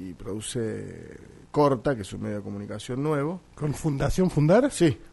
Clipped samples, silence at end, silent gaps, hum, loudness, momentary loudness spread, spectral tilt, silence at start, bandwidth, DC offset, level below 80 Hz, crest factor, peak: under 0.1%; 0.05 s; none; none; -26 LUFS; 15 LU; -6.5 dB/octave; 0 s; 11.5 kHz; under 0.1%; -44 dBFS; 18 dB; -8 dBFS